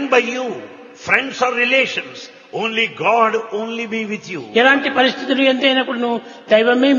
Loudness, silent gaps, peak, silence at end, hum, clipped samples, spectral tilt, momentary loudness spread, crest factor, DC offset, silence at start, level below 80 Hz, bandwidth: -16 LUFS; none; 0 dBFS; 0 s; none; under 0.1%; -3.5 dB/octave; 14 LU; 18 dB; under 0.1%; 0 s; -66 dBFS; 7.4 kHz